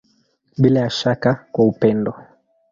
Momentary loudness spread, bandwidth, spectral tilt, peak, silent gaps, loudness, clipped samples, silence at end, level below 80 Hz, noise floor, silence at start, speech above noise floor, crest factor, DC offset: 8 LU; 7.6 kHz; -7 dB/octave; -2 dBFS; none; -18 LUFS; under 0.1%; 0.5 s; -54 dBFS; -62 dBFS; 0.6 s; 45 dB; 18 dB; under 0.1%